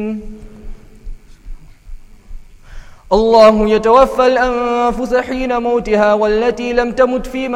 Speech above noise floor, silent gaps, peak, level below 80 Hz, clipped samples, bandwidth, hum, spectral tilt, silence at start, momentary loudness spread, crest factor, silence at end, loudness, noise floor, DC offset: 20 dB; none; 0 dBFS; -32 dBFS; under 0.1%; 13 kHz; none; -5.5 dB/octave; 0 s; 9 LU; 14 dB; 0 s; -13 LUFS; -33 dBFS; under 0.1%